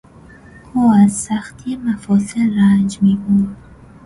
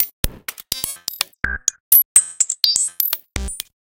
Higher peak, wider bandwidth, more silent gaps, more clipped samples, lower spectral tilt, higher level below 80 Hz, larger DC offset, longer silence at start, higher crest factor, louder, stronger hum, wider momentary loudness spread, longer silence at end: about the same, -2 dBFS vs 0 dBFS; second, 11.5 kHz vs over 20 kHz; second, none vs 0.13-0.23 s, 1.80-1.91 s, 2.05-2.15 s; neither; first, -6.5 dB/octave vs 0.5 dB/octave; second, -46 dBFS vs -36 dBFS; neither; first, 0.75 s vs 0 s; second, 14 dB vs 20 dB; about the same, -16 LUFS vs -17 LUFS; neither; second, 11 LU vs 15 LU; first, 0.5 s vs 0.25 s